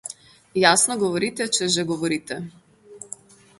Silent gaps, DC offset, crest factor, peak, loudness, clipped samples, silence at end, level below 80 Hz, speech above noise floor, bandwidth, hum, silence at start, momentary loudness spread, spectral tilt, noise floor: none; under 0.1%; 22 dB; -2 dBFS; -21 LUFS; under 0.1%; 0.55 s; -64 dBFS; 23 dB; 12 kHz; none; 0.05 s; 23 LU; -2.5 dB/octave; -45 dBFS